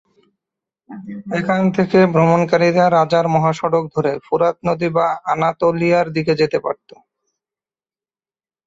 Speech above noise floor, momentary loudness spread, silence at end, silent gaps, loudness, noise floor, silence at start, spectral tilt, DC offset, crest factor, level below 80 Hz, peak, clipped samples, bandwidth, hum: over 74 dB; 9 LU; 1.95 s; none; -16 LUFS; under -90 dBFS; 0.9 s; -7 dB/octave; under 0.1%; 16 dB; -56 dBFS; -2 dBFS; under 0.1%; 7.8 kHz; none